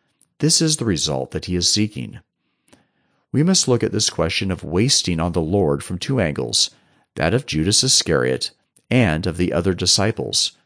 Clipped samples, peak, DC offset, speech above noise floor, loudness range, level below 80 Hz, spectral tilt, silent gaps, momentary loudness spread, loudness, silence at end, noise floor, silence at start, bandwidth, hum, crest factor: under 0.1%; -4 dBFS; under 0.1%; 47 dB; 3 LU; -44 dBFS; -3.5 dB/octave; none; 9 LU; -18 LUFS; 0.15 s; -66 dBFS; 0.4 s; 10.5 kHz; none; 16 dB